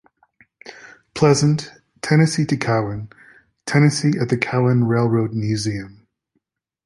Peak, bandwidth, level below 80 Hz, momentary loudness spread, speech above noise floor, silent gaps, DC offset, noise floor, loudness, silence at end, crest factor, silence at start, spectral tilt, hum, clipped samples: -2 dBFS; 11.5 kHz; -52 dBFS; 18 LU; 54 dB; none; under 0.1%; -72 dBFS; -19 LUFS; 0.95 s; 18 dB; 0.65 s; -6 dB/octave; none; under 0.1%